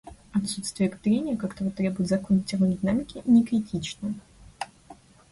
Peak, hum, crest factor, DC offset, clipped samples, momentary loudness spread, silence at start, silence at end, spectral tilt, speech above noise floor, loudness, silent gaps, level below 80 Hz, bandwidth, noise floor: -10 dBFS; none; 16 dB; under 0.1%; under 0.1%; 15 LU; 0.05 s; 0.4 s; -6 dB/octave; 26 dB; -26 LUFS; none; -54 dBFS; 11.5 kHz; -51 dBFS